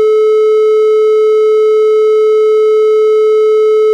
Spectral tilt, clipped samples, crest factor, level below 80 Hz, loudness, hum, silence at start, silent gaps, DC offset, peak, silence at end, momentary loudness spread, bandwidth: -2 dB/octave; under 0.1%; 4 dB; -86 dBFS; -9 LUFS; none; 0 s; none; under 0.1%; -4 dBFS; 0 s; 0 LU; 7.8 kHz